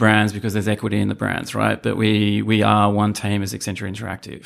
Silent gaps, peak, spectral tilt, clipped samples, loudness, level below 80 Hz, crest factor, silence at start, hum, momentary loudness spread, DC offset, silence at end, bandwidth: none; -2 dBFS; -5.5 dB/octave; under 0.1%; -20 LUFS; -52 dBFS; 18 dB; 0 s; none; 11 LU; under 0.1%; 0.05 s; 15 kHz